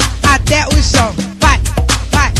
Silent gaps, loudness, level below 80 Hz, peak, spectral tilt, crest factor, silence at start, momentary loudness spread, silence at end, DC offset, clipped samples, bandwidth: none; -12 LUFS; -16 dBFS; 0 dBFS; -3.5 dB/octave; 12 dB; 0 s; 3 LU; 0 s; under 0.1%; under 0.1%; 14 kHz